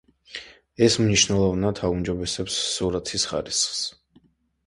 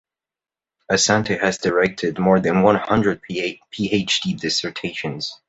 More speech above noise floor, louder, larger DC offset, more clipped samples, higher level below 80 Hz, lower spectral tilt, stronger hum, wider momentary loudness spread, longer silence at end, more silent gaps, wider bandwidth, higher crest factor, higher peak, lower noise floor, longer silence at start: second, 37 dB vs over 70 dB; second, -23 LUFS vs -20 LUFS; neither; neither; about the same, -46 dBFS vs -50 dBFS; about the same, -3.5 dB/octave vs -4 dB/octave; neither; first, 15 LU vs 10 LU; first, 0.75 s vs 0.15 s; neither; first, 11.5 kHz vs 8.2 kHz; about the same, 20 dB vs 18 dB; about the same, -4 dBFS vs -2 dBFS; second, -60 dBFS vs under -90 dBFS; second, 0.3 s vs 0.9 s